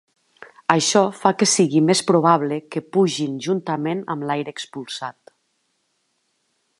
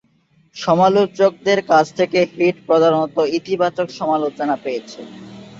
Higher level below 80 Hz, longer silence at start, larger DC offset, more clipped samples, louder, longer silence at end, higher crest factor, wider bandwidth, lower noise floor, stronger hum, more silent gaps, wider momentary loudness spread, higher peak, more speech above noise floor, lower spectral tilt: second, -72 dBFS vs -62 dBFS; second, 0.4 s vs 0.55 s; neither; neither; second, -20 LUFS vs -17 LUFS; first, 1.7 s vs 0 s; about the same, 20 dB vs 16 dB; first, 11.5 kHz vs 7.8 kHz; first, -70 dBFS vs -58 dBFS; neither; neither; about the same, 14 LU vs 12 LU; about the same, 0 dBFS vs -2 dBFS; first, 50 dB vs 41 dB; second, -4 dB/octave vs -5.5 dB/octave